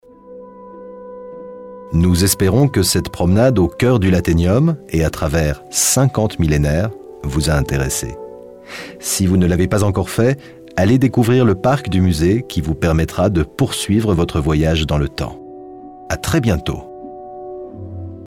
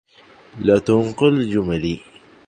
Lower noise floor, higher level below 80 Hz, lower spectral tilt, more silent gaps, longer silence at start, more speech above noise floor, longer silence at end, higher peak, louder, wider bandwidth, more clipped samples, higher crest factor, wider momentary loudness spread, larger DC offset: second, -38 dBFS vs -49 dBFS; first, -30 dBFS vs -46 dBFS; second, -5.5 dB/octave vs -7.5 dB/octave; neither; second, 0.25 s vs 0.55 s; second, 23 dB vs 31 dB; second, 0 s vs 0.5 s; about the same, -2 dBFS vs -2 dBFS; about the same, -16 LUFS vs -18 LUFS; first, 17 kHz vs 9.6 kHz; neither; about the same, 14 dB vs 18 dB; first, 20 LU vs 9 LU; neither